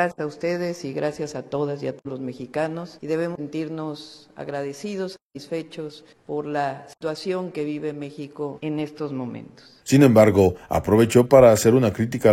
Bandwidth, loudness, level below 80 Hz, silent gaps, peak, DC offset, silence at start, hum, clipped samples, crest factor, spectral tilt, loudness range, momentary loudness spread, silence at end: 16.5 kHz; -22 LUFS; -52 dBFS; 5.22-5.30 s; -2 dBFS; under 0.1%; 0 s; none; under 0.1%; 20 dB; -6.5 dB/octave; 13 LU; 19 LU; 0 s